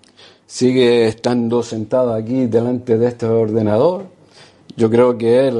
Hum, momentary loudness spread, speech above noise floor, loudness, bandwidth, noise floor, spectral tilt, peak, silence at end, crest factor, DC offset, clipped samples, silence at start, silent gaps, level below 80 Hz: none; 6 LU; 32 dB; -16 LUFS; 11 kHz; -46 dBFS; -6.5 dB/octave; 0 dBFS; 0 s; 14 dB; under 0.1%; under 0.1%; 0.5 s; none; -56 dBFS